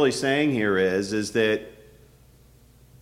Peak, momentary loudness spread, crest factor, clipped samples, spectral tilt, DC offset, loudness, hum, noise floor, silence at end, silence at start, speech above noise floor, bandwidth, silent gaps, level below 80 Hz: -8 dBFS; 5 LU; 16 dB; under 0.1%; -4.5 dB/octave; under 0.1%; -23 LUFS; 60 Hz at -55 dBFS; -54 dBFS; 1.3 s; 0 s; 31 dB; 15.5 kHz; none; -58 dBFS